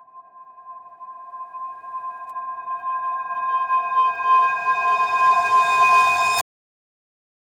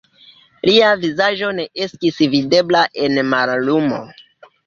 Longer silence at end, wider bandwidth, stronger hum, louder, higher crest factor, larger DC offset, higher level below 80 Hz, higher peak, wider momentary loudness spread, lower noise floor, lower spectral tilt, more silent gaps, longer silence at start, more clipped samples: first, 1 s vs 0.45 s; first, over 20 kHz vs 7.4 kHz; neither; second, -19 LUFS vs -16 LUFS; about the same, 14 dB vs 16 dB; neither; second, -68 dBFS vs -56 dBFS; second, -6 dBFS vs 0 dBFS; first, 20 LU vs 9 LU; about the same, -45 dBFS vs -48 dBFS; second, 0 dB/octave vs -5 dB/octave; neither; second, 0.15 s vs 0.65 s; neither